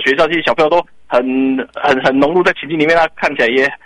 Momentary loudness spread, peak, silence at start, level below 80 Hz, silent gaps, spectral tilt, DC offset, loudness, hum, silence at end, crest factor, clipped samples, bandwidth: 5 LU; 0 dBFS; 0 s; -46 dBFS; none; -5.5 dB/octave; under 0.1%; -13 LUFS; none; 0.1 s; 12 dB; under 0.1%; 10.5 kHz